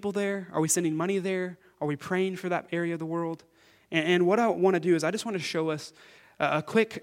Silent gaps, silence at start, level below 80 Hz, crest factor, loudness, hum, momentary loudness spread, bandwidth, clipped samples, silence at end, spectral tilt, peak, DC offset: none; 0 s; -74 dBFS; 20 dB; -28 LUFS; none; 10 LU; 16 kHz; under 0.1%; 0 s; -4.5 dB/octave; -8 dBFS; under 0.1%